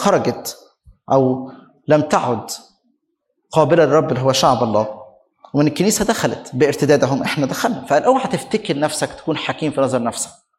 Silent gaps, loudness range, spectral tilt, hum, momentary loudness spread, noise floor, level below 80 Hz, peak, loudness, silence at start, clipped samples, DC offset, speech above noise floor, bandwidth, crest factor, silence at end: none; 3 LU; -5 dB/octave; none; 11 LU; -71 dBFS; -52 dBFS; 0 dBFS; -17 LUFS; 0 s; under 0.1%; under 0.1%; 54 dB; 16 kHz; 18 dB; 0.3 s